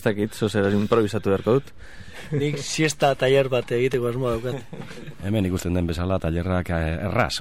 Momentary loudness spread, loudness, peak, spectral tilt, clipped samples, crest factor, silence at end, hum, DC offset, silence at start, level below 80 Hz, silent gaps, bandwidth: 11 LU; -23 LUFS; -6 dBFS; -5.5 dB/octave; under 0.1%; 16 dB; 0 s; none; 0.9%; 0 s; -42 dBFS; none; 16.5 kHz